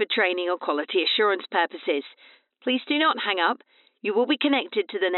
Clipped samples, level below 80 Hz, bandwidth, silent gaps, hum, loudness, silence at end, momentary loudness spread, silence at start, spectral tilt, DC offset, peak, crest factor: under 0.1%; under -90 dBFS; 4.3 kHz; none; none; -24 LUFS; 0 s; 7 LU; 0 s; 1 dB/octave; under 0.1%; -8 dBFS; 18 dB